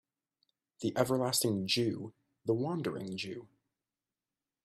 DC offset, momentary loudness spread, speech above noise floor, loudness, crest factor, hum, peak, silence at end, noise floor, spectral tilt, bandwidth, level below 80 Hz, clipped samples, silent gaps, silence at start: under 0.1%; 13 LU; over 57 dB; -34 LUFS; 24 dB; none; -12 dBFS; 1.2 s; under -90 dBFS; -4.5 dB/octave; 15 kHz; -74 dBFS; under 0.1%; none; 0.8 s